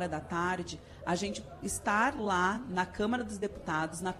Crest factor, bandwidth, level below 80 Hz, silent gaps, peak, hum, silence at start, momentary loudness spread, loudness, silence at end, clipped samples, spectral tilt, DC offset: 16 dB; 14 kHz; -54 dBFS; none; -16 dBFS; none; 0 s; 9 LU; -33 LUFS; 0 s; under 0.1%; -4.5 dB/octave; under 0.1%